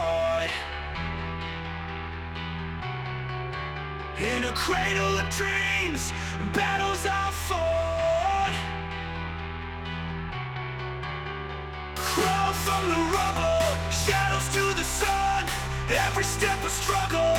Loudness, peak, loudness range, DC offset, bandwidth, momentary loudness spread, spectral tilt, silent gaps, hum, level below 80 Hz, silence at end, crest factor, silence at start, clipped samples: -27 LUFS; -10 dBFS; 8 LU; under 0.1%; 19 kHz; 10 LU; -3.5 dB/octave; none; none; -40 dBFS; 0 s; 18 dB; 0 s; under 0.1%